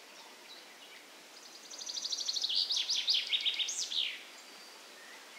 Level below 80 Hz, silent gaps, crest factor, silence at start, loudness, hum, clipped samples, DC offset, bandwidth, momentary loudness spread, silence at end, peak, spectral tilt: under -90 dBFS; none; 20 dB; 0 s; -32 LUFS; none; under 0.1%; under 0.1%; 16 kHz; 22 LU; 0 s; -18 dBFS; 3.5 dB/octave